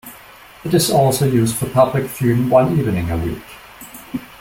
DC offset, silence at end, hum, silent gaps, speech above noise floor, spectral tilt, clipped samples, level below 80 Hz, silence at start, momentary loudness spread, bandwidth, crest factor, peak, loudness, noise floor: under 0.1%; 0.05 s; none; none; 26 dB; -6 dB/octave; under 0.1%; -42 dBFS; 0.05 s; 21 LU; 16.5 kHz; 16 dB; -2 dBFS; -16 LUFS; -42 dBFS